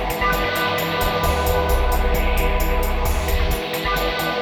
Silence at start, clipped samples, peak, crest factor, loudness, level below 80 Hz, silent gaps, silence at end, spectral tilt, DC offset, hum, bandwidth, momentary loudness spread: 0 s; under 0.1%; -6 dBFS; 14 dB; -21 LUFS; -22 dBFS; none; 0 s; -4.5 dB/octave; under 0.1%; none; over 20 kHz; 3 LU